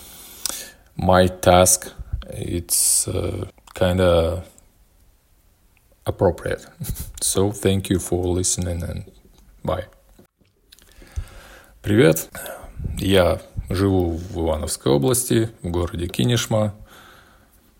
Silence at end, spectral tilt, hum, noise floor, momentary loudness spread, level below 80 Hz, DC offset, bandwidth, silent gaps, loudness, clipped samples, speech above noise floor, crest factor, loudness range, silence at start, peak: 0.8 s; -4.5 dB/octave; none; -59 dBFS; 17 LU; -40 dBFS; under 0.1%; 16.5 kHz; none; -20 LUFS; under 0.1%; 39 dB; 22 dB; 7 LU; 0 s; 0 dBFS